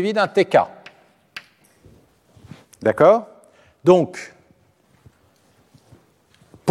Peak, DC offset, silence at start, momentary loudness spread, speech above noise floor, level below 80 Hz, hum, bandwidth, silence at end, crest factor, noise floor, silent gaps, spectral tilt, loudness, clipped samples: -2 dBFS; under 0.1%; 0 s; 24 LU; 42 dB; -64 dBFS; none; 12 kHz; 0 s; 20 dB; -58 dBFS; none; -6.5 dB/octave; -18 LUFS; under 0.1%